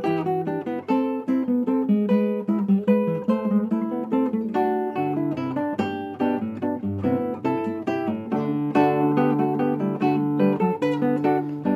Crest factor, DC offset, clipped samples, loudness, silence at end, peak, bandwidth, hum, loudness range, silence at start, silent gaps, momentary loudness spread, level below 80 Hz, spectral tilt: 14 dB; under 0.1%; under 0.1%; -23 LUFS; 0 s; -8 dBFS; 12.5 kHz; none; 4 LU; 0 s; none; 6 LU; -58 dBFS; -9 dB/octave